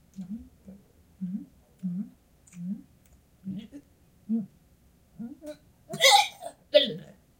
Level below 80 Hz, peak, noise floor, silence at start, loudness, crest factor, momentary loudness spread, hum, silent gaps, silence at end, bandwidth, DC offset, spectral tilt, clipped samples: -64 dBFS; -6 dBFS; -61 dBFS; 0.15 s; -25 LUFS; 26 dB; 24 LU; none; none; 0.3 s; 16 kHz; under 0.1%; -2.5 dB/octave; under 0.1%